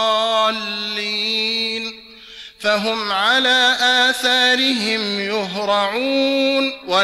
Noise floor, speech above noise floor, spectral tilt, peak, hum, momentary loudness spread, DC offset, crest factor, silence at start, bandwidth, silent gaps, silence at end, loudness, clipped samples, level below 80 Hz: -39 dBFS; 22 dB; -2 dB/octave; -6 dBFS; none; 9 LU; under 0.1%; 14 dB; 0 s; 15.5 kHz; none; 0 s; -17 LUFS; under 0.1%; -60 dBFS